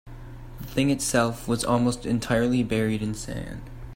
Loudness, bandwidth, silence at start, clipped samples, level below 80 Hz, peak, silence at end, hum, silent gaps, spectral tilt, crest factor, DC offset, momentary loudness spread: -25 LUFS; 16 kHz; 0.05 s; under 0.1%; -42 dBFS; -8 dBFS; 0 s; none; none; -5 dB/octave; 18 dB; under 0.1%; 17 LU